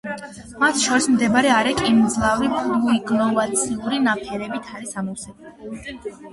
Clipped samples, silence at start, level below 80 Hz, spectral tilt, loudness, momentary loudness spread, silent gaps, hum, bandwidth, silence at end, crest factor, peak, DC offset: under 0.1%; 0.05 s; -48 dBFS; -3.5 dB/octave; -19 LUFS; 17 LU; none; none; 11.5 kHz; 0 s; 16 dB; -4 dBFS; under 0.1%